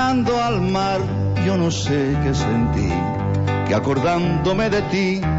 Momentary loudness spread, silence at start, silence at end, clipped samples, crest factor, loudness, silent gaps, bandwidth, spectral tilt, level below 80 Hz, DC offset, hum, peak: 3 LU; 0 s; 0 s; under 0.1%; 10 dB; -20 LUFS; none; 8 kHz; -6.5 dB/octave; -34 dBFS; under 0.1%; none; -8 dBFS